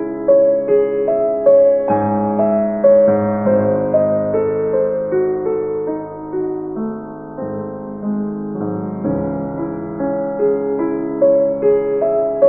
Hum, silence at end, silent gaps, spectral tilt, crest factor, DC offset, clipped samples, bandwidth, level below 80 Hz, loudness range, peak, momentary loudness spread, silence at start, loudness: none; 0 s; none; -13 dB/octave; 14 dB; 0.2%; under 0.1%; 2.8 kHz; -50 dBFS; 9 LU; -2 dBFS; 12 LU; 0 s; -17 LUFS